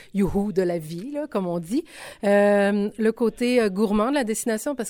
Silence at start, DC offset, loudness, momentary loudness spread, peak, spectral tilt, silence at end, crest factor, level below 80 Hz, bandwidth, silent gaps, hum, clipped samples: 0.15 s; under 0.1%; -23 LUFS; 9 LU; -8 dBFS; -5.5 dB/octave; 0 s; 14 dB; -46 dBFS; 17.5 kHz; none; none; under 0.1%